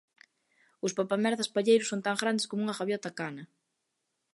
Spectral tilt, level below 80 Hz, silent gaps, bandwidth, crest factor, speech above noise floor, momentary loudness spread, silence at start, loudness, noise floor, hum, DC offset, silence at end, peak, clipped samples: -4 dB/octave; -82 dBFS; none; 11.5 kHz; 22 dB; 52 dB; 12 LU; 0.85 s; -30 LUFS; -82 dBFS; none; under 0.1%; 0.9 s; -10 dBFS; under 0.1%